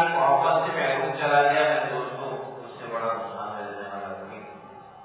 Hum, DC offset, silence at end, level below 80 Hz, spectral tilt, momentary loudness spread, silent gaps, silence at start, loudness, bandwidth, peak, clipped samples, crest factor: none; under 0.1%; 0 s; -72 dBFS; -8.5 dB/octave; 19 LU; none; 0 s; -25 LUFS; 4 kHz; -8 dBFS; under 0.1%; 18 dB